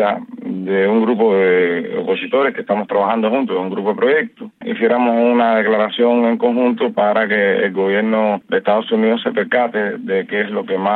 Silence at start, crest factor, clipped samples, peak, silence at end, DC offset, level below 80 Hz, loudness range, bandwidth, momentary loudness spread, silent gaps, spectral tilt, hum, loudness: 0 s; 12 dB; under 0.1%; -4 dBFS; 0 s; under 0.1%; -72 dBFS; 2 LU; 4.3 kHz; 6 LU; none; -8.5 dB/octave; none; -16 LUFS